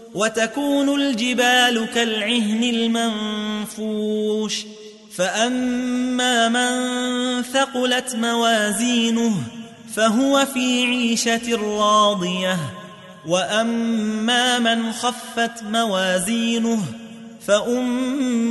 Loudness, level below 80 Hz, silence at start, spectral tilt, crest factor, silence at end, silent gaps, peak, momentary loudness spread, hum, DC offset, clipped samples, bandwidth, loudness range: -20 LUFS; -64 dBFS; 0 s; -3 dB/octave; 16 dB; 0 s; none; -4 dBFS; 9 LU; none; under 0.1%; under 0.1%; 12 kHz; 3 LU